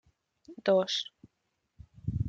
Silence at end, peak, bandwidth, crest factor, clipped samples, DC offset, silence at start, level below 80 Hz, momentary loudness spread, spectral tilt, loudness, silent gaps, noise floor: 0 s; -14 dBFS; 7.8 kHz; 18 dB; under 0.1%; under 0.1%; 0.5 s; -54 dBFS; 14 LU; -5 dB/octave; -30 LUFS; none; -80 dBFS